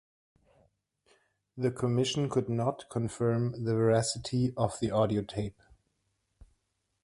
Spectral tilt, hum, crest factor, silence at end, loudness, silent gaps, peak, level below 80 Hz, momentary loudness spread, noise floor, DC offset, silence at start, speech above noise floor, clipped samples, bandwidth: -6 dB/octave; none; 20 dB; 1.5 s; -31 LUFS; none; -12 dBFS; -58 dBFS; 8 LU; -78 dBFS; under 0.1%; 1.55 s; 49 dB; under 0.1%; 11.5 kHz